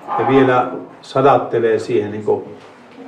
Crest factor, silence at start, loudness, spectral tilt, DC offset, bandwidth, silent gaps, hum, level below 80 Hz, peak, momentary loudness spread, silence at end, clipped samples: 16 dB; 0 s; -16 LUFS; -7 dB/octave; under 0.1%; 9.6 kHz; none; none; -54 dBFS; 0 dBFS; 11 LU; 0 s; under 0.1%